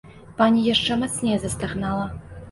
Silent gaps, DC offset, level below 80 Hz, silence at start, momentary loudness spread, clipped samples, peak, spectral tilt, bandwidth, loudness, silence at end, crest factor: none; under 0.1%; -44 dBFS; 0.05 s; 13 LU; under 0.1%; -6 dBFS; -4.5 dB/octave; 11.5 kHz; -22 LUFS; 0 s; 18 dB